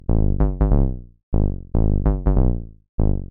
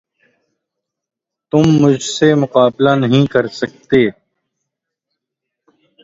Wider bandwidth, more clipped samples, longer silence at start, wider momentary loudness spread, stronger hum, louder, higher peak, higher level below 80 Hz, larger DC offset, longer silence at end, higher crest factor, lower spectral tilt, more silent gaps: second, 2.2 kHz vs 8 kHz; neither; second, 0.1 s vs 1.55 s; about the same, 8 LU vs 6 LU; neither; second, -22 LUFS vs -13 LUFS; second, -4 dBFS vs 0 dBFS; first, -20 dBFS vs -52 dBFS; neither; second, 0.05 s vs 1.9 s; about the same, 14 dB vs 16 dB; first, -14 dB/octave vs -6 dB/octave; first, 1.23-1.32 s, 2.89-2.98 s vs none